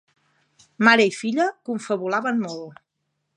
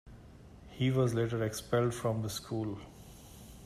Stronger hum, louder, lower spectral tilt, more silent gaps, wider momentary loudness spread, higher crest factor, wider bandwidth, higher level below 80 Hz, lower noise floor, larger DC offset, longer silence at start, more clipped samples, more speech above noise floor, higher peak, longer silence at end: neither; first, -21 LUFS vs -33 LUFS; second, -4.5 dB/octave vs -6 dB/octave; neither; second, 16 LU vs 23 LU; about the same, 22 dB vs 18 dB; second, 10.5 kHz vs 14.5 kHz; second, -78 dBFS vs -58 dBFS; first, -76 dBFS vs -53 dBFS; neither; first, 0.8 s vs 0.05 s; neither; first, 55 dB vs 21 dB; first, -2 dBFS vs -18 dBFS; first, 0.65 s vs 0 s